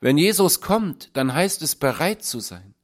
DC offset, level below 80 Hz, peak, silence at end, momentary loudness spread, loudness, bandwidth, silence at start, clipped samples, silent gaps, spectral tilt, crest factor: under 0.1%; -54 dBFS; -4 dBFS; 0.25 s; 11 LU; -21 LUFS; 16.5 kHz; 0 s; under 0.1%; none; -4 dB/octave; 16 dB